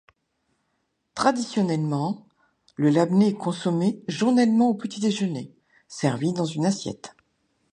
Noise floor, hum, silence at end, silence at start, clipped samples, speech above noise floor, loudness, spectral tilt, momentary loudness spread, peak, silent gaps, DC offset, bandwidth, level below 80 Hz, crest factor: -74 dBFS; none; 0.6 s; 1.15 s; under 0.1%; 52 dB; -24 LUFS; -6 dB/octave; 17 LU; -4 dBFS; none; under 0.1%; 10.5 kHz; -68 dBFS; 20 dB